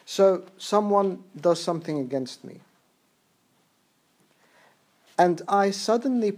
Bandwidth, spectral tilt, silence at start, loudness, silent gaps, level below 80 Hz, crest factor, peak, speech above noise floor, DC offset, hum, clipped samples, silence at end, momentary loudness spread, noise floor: 15.5 kHz; -5.5 dB/octave; 0.1 s; -24 LUFS; none; -86 dBFS; 20 dB; -6 dBFS; 43 dB; under 0.1%; none; under 0.1%; 0 s; 10 LU; -67 dBFS